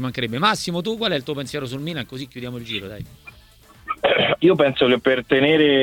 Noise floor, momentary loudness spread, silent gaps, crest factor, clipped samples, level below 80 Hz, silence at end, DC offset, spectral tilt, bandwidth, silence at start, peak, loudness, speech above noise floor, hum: -49 dBFS; 16 LU; none; 18 dB; under 0.1%; -52 dBFS; 0 s; under 0.1%; -5 dB/octave; 18.5 kHz; 0 s; -4 dBFS; -20 LUFS; 29 dB; none